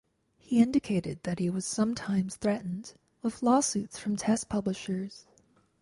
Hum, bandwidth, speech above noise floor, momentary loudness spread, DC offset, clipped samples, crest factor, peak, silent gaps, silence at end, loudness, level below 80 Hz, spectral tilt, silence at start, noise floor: none; 11.5 kHz; 36 dB; 11 LU; under 0.1%; under 0.1%; 18 dB; -12 dBFS; none; 0.6 s; -30 LUFS; -60 dBFS; -5 dB/octave; 0.5 s; -65 dBFS